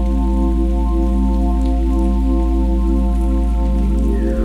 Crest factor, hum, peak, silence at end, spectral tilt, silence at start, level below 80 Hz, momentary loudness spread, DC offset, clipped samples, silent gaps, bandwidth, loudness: 8 dB; none; -6 dBFS; 0 s; -9 dB/octave; 0 s; -16 dBFS; 1 LU; under 0.1%; under 0.1%; none; 4.3 kHz; -18 LUFS